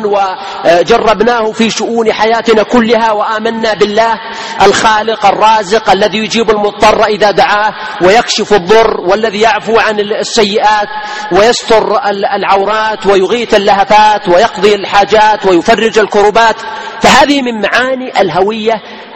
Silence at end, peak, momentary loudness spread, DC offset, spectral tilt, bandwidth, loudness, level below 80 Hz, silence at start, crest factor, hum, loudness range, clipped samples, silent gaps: 0 s; 0 dBFS; 6 LU; 0.9%; -3.5 dB/octave; 12.5 kHz; -8 LUFS; -38 dBFS; 0 s; 8 dB; none; 2 LU; 1%; none